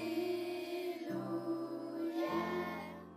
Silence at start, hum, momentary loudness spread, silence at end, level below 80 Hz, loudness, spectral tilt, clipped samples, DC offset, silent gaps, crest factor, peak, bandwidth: 0 s; none; 5 LU; 0 s; -76 dBFS; -40 LUFS; -6 dB/octave; under 0.1%; under 0.1%; none; 14 dB; -26 dBFS; 15.5 kHz